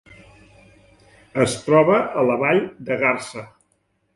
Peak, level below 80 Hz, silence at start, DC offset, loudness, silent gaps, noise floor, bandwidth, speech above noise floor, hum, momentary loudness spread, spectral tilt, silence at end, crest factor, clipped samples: -4 dBFS; -58 dBFS; 1.35 s; under 0.1%; -19 LUFS; none; -67 dBFS; 11.5 kHz; 48 dB; none; 13 LU; -5.5 dB/octave; 0.7 s; 18 dB; under 0.1%